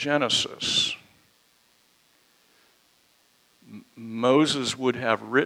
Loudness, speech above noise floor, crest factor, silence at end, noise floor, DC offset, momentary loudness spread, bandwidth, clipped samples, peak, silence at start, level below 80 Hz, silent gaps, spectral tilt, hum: -23 LUFS; 40 dB; 22 dB; 0 s; -63 dBFS; under 0.1%; 17 LU; 15.5 kHz; under 0.1%; -6 dBFS; 0 s; -68 dBFS; none; -3 dB/octave; none